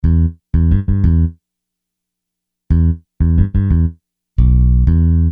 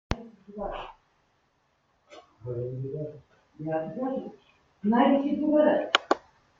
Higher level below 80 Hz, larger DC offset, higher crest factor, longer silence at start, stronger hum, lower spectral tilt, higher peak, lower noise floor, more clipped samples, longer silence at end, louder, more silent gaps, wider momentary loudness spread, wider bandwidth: first, -18 dBFS vs -52 dBFS; neither; second, 12 dB vs 28 dB; about the same, 0.05 s vs 0.1 s; first, 60 Hz at -40 dBFS vs none; first, -12.5 dB/octave vs -6 dB/octave; about the same, -2 dBFS vs -2 dBFS; first, -79 dBFS vs -70 dBFS; neither; second, 0 s vs 0.4 s; first, -15 LUFS vs -28 LUFS; neither; second, 6 LU vs 18 LU; second, 2.1 kHz vs 7.6 kHz